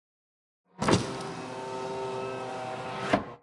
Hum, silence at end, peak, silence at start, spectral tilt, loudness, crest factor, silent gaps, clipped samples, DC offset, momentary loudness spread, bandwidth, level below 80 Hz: none; 0.05 s; -8 dBFS; 0.8 s; -5 dB/octave; -32 LUFS; 24 dB; none; under 0.1%; under 0.1%; 10 LU; 11.5 kHz; -58 dBFS